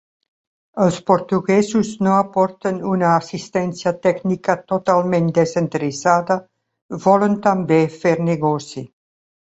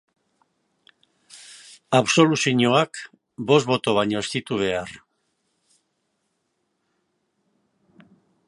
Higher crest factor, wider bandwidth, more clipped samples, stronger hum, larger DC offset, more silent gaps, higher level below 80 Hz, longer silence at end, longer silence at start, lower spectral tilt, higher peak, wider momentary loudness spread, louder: second, 16 dB vs 24 dB; second, 8.2 kHz vs 11.5 kHz; neither; neither; neither; first, 6.82-6.89 s vs none; about the same, -58 dBFS vs -62 dBFS; second, 0.7 s vs 3.5 s; second, 0.75 s vs 1.35 s; first, -6.5 dB/octave vs -4.5 dB/octave; about the same, -2 dBFS vs -2 dBFS; second, 7 LU vs 22 LU; first, -18 LUFS vs -21 LUFS